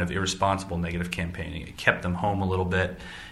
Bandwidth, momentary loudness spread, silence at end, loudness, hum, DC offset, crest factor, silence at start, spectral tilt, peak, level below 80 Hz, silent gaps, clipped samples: 12.5 kHz; 8 LU; 0 s; -27 LUFS; none; under 0.1%; 24 dB; 0 s; -5 dB/octave; -2 dBFS; -44 dBFS; none; under 0.1%